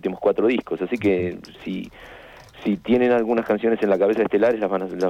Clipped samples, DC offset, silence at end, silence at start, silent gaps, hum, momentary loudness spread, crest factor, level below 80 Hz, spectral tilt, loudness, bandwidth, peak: under 0.1%; under 0.1%; 0 s; 0.05 s; none; none; 13 LU; 12 dB; -54 dBFS; -7.5 dB/octave; -21 LUFS; 14 kHz; -10 dBFS